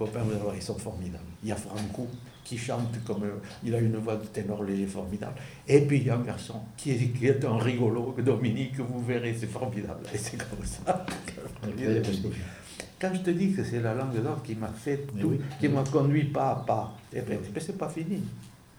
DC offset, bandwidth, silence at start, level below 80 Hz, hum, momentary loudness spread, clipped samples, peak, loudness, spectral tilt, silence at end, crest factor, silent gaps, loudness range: under 0.1%; 17 kHz; 0 s; -54 dBFS; none; 12 LU; under 0.1%; -6 dBFS; -30 LUFS; -7 dB/octave; 0.25 s; 22 dB; none; 5 LU